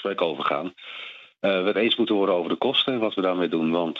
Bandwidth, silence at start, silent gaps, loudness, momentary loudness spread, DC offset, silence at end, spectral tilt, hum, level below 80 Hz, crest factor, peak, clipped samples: 7.4 kHz; 0 s; none; -23 LUFS; 14 LU; under 0.1%; 0 s; -6.5 dB/octave; none; -78 dBFS; 16 dB; -8 dBFS; under 0.1%